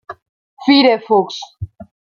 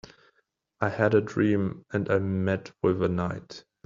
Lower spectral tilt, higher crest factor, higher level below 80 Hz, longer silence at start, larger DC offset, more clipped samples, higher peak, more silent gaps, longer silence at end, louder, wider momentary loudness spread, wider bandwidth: second, -5.5 dB/octave vs -7 dB/octave; about the same, 16 dB vs 20 dB; first, -50 dBFS vs -60 dBFS; second, 0.1 s vs 0.8 s; neither; neither; first, -2 dBFS vs -8 dBFS; first, 0.22-0.57 s vs none; about the same, 0.35 s vs 0.25 s; first, -14 LUFS vs -27 LUFS; first, 21 LU vs 8 LU; about the same, 7.2 kHz vs 7.6 kHz